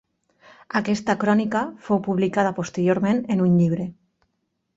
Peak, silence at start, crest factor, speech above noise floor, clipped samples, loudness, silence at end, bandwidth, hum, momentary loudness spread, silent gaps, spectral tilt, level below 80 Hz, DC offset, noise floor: -6 dBFS; 0.75 s; 18 dB; 53 dB; under 0.1%; -22 LUFS; 0.85 s; 8 kHz; none; 7 LU; none; -7 dB/octave; -60 dBFS; under 0.1%; -74 dBFS